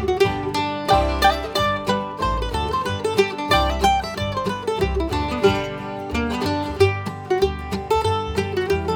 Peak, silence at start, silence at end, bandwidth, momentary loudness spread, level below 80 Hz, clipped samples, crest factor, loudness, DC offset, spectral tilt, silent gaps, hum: -4 dBFS; 0 s; 0 s; over 20 kHz; 6 LU; -32 dBFS; under 0.1%; 18 dB; -21 LUFS; under 0.1%; -5 dB/octave; none; none